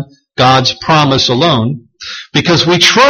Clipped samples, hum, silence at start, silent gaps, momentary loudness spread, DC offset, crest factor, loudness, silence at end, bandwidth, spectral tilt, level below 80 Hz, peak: 0.2%; none; 0 s; none; 17 LU; under 0.1%; 10 dB; -10 LUFS; 0 s; 17 kHz; -4 dB/octave; -42 dBFS; 0 dBFS